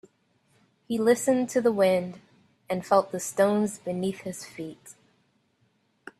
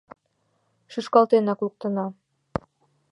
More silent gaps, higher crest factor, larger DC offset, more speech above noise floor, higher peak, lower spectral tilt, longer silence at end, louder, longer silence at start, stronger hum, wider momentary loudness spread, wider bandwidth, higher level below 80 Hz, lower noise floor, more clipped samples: neither; about the same, 20 dB vs 22 dB; neither; second, 44 dB vs 49 dB; second, -8 dBFS vs -4 dBFS; second, -5 dB/octave vs -7.5 dB/octave; first, 1.3 s vs 1 s; about the same, -26 LUFS vs -24 LUFS; about the same, 0.9 s vs 0.9 s; neither; about the same, 15 LU vs 16 LU; first, 14.5 kHz vs 9.8 kHz; second, -70 dBFS vs -58 dBFS; about the same, -69 dBFS vs -71 dBFS; neither